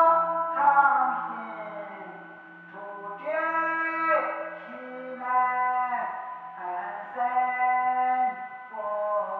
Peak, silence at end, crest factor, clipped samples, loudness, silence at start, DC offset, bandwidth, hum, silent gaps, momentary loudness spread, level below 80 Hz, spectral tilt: -8 dBFS; 0 s; 20 dB; under 0.1%; -26 LUFS; 0 s; under 0.1%; 4.5 kHz; none; none; 17 LU; -90 dBFS; -7 dB/octave